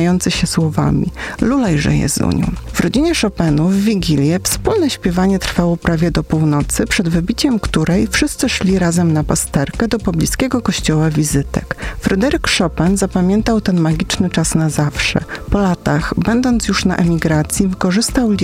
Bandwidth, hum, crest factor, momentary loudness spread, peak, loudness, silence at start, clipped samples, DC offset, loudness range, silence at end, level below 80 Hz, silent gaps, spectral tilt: 16 kHz; none; 14 dB; 3 LU; -2 dBFS; -15 LUFS; 0 s; under 0.1%; under 0.1%; 1 LU; 0 s; -28 dBFS; none; -5 dB/octave